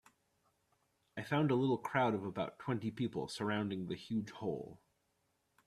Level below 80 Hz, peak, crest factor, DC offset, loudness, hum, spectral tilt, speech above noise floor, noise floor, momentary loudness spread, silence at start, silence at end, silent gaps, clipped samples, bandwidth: -74 dBFS; -18 dBFS; 20 dB; under 0.1%; -38 LUFS; none; -6.5 dB/octave; 43 dB; -80 dBFS; 10 LU; 1.15 s; 0.9 s; none; under 0.1%; 13.5 kHz